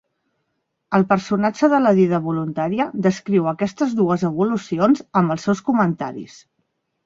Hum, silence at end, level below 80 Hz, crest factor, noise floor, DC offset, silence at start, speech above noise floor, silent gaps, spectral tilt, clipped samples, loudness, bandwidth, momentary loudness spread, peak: none; 0.8 s; -60 dBFS; 18 dB; -74 dBFS; under 0.1%; 0.9 s; 55 dB; none; -7.5 dB/octave; under 0.1%; -19 LUFS; 7.6 kHz; 7 LU; -2 dBFS